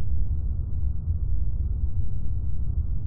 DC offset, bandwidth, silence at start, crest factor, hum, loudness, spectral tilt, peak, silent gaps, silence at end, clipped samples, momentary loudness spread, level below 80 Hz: under 0.1%; 1.5 kHz; 0 s; 10 dB; none; -30 LUFS; -15.5 dB/octave; -12 dBFS; none; 0 s; under 0.1%; 2 LU; -28 dBFS